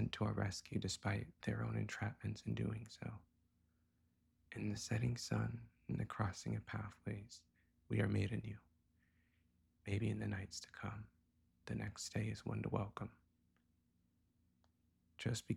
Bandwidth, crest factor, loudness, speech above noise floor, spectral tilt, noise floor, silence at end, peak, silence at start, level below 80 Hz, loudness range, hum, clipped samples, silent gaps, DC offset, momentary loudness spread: 12.5 kHz; 22 dB; -44 LUFS; 36 dB; -5.5 dB/octave; -79 dBFS; 0 s; -22 dBFS; 0 s; -66 dBFS; 4 LU; 60 Hz at -70 dBFS; under 0.1%; none; under 0.1%; 12 LU